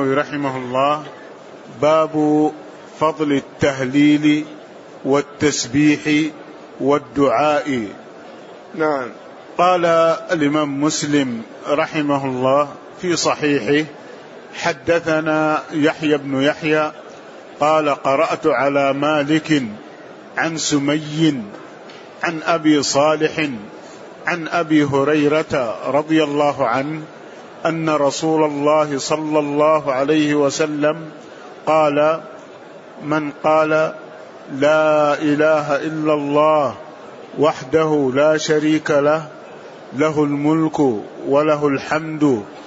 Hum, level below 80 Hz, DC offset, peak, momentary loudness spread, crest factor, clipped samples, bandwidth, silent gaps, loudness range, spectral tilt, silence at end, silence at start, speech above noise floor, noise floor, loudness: none; -60 dBFS; under 0.1%; -2 dBFS; 21 LU; 16 dB; under 0.1%; 8 kHz; none; 2 LU; -5 dB/octave; 0 s; 0 s; 21 dB; -38 dBFS; -18 LUFS